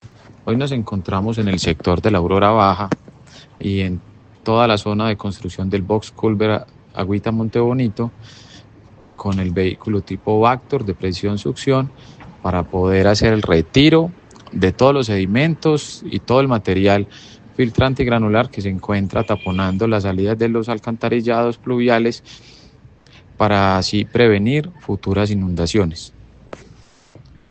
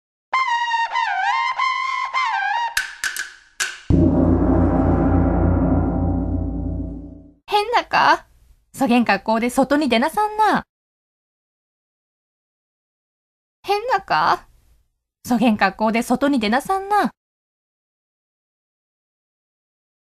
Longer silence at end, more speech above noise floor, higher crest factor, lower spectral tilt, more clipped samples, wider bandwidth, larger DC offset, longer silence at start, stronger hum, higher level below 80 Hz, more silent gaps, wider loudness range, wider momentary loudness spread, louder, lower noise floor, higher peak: second, 0.95 s vs 3 s; second, 30 dB vs 46 dB; about the same, 18 dB vs 20 dB; about the same, -6.5 dB/octave vs -5.5 dB/octave; neither; second, 8.8 kHz vs 14 kHz; neither; second, 0.05 s vs 0.3 s; neither; second, -44 dBFS vs -34 dBFS; second, none vs 10.69-13.63 s; about the same, 5 LU vs 7 LU; about the same, 11 LU vs 9 LU; about the same, -18 LUFS vs -19 LUFS; second, -47 dBFS vs -64 dBFS; about the same, 0 dBFS vs 0 dBFS